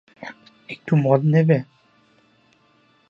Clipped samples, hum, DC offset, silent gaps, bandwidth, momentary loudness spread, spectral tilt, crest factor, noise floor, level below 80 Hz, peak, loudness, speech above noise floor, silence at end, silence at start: under 0.1%; none; under 0.1%; none; 5.2 kHz; 22 LU; -10 dB/octave; 20 dB; -59 dBFS; -68 dBFS; -2 dBFS; -19 LUFS; 41 dB; 1.45 s; 0.2 s